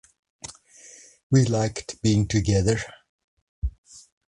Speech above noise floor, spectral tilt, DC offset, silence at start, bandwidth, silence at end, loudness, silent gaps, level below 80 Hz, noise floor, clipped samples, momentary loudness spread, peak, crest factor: 28 dB; -6 dB/octave; under 0.1%; 0.45 s; 11 kHz; 0.3 s; -24 LUFS; 1.23-1.30 s, 3.09-3.62 s, 3.78-3.84 s; -40 dBFS; -50 dBFS; under 0.1%; 20 LU; -6 dBFS; 20 dB